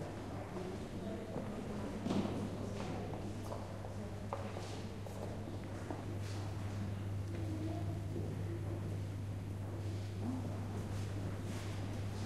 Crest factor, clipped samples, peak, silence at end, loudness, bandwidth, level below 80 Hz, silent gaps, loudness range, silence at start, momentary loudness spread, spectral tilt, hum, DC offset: 18 dB; under 0.1%; -24 dBFS; 0 s; -43 LUFS; 13.5 kHz; -56 dBFS; none; 2 LU; 0 s; 4 LU; -7 dB/octave; none; 0.1%